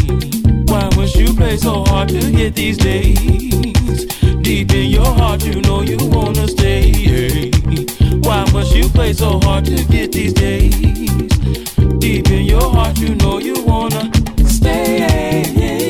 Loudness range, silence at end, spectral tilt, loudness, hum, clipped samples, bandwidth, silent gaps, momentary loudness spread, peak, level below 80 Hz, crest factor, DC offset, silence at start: 1 LU; 0 s; -6 dB/octave; -14 LUFS; none; under 0.1%; 16 kHz; none; 3 LU; 0 dBFS; -16 dBFS; 12 dB; 0.3%; 0 s